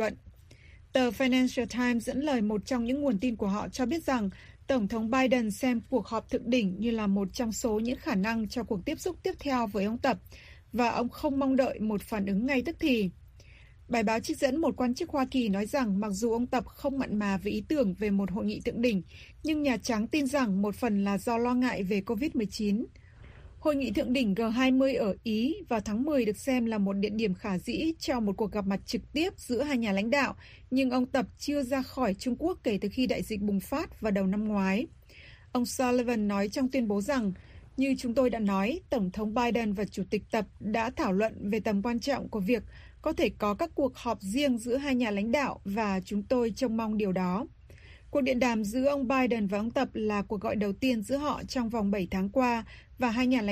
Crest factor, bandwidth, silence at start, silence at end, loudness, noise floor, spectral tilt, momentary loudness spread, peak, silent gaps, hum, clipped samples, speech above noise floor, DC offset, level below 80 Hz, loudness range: 18 dB; 15.5 kHz; 0 s; 0 s; -30 LUFS; -53 dBFS; -5.5 dB/octave; 5 LU; -12 dBFS; none; none; under 0.1%; 24 dB; under 0.1%; -52 dBFS; 2 LU